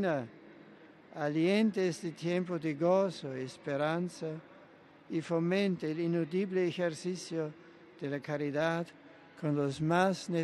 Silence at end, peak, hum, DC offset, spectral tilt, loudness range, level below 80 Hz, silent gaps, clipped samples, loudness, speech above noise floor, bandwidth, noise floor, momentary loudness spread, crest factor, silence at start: 0 s; -14 dBFS; none; under 0.1%; -6.5 dB/octave; 3 LU; -76 dBFS; none; under 0.1%; -33 LUFS; 25 dB; 12 kHz; -58 dBFS; 11 LU; 18 dB; 0 s